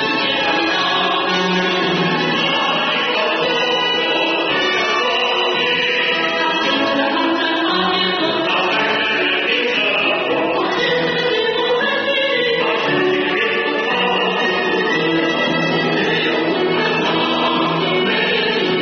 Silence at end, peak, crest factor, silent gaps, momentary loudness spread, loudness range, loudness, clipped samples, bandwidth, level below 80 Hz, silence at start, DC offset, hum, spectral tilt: 0 s; -4 dBFS; 12 dB; none; 1 LU; 1 LU; -16 LUFS; under 0.1%; 6.6 kHz; -58 dBFS; 0 s; under 0.1%; none; -1 dB/octave